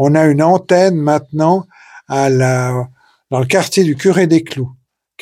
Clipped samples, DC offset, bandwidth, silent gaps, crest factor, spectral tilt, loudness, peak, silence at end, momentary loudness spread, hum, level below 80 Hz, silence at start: under 0.1%; under 0.1%; 15.5 kHz; none; 14 dB; -6 dB/octave; -13 LUFS; 0 dBFS; 0.5 s; 11 LU; none; -52 dBFS; 0 s